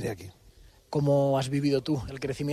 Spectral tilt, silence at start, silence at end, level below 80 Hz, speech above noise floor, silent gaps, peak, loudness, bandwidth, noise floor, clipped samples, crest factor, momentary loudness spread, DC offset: -7 dB/octave; 0 s; 0 s; -52 dBFS; 28 dB; none; -14 dBFS; -28 LUFS; 13.5 kHz; -55 dBFS; under 0.1%; 14 dB; 13 LU; under 0.1%